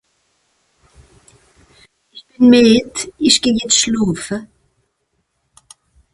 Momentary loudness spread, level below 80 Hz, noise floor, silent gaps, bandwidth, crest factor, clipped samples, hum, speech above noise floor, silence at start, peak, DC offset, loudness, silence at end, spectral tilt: 15 LU; -50 dBFS; -68 dBFS; none; 11.5 kHz; 18 dB; under 0.1%; none; 55 dB; 2.15 s; 0 dBFS; under 0.1%; -13 LUFS; 1.7 s; -3 dB/octave